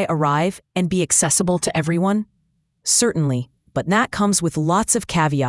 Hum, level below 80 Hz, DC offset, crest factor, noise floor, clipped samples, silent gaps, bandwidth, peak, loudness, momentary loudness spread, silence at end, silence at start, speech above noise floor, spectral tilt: none; -50 dBFS; under 0.1%; 18 dB; -66 dBFS; under 0.1%; none; 12 kHz; -2 dBFS; -19 LUFS; 9 LU; 0 s; 0 s; 48 dB; -4 dB/octave